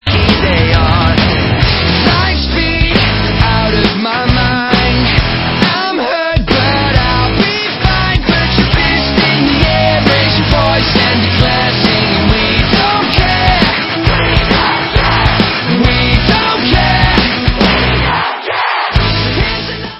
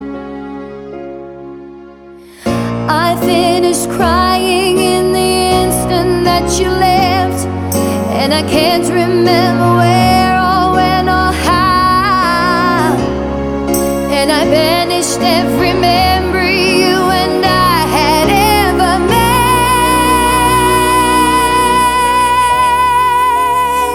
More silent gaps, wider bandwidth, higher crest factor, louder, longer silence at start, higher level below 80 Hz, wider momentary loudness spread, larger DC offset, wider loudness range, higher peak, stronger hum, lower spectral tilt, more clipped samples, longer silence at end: neither; second, 8 kHz vs 19 kHz; about the same, 10 dB vs 12 dB; about the same, -10 LUFS vs -11 LUFS; about the same, 0.05 s vs 0 s; first, -18 dBFS vs -28 dBFS; second, 3 LU vs 7 LU; neither; about the same, 2 LU vs 3 LU; about the same, 0 dBFS vs 0 dBFS; neither; first, -7 dB/octave vs -4.5 dB/octave; first, 0.3% vs under 0.1%; about the same, 0 s vs 0 s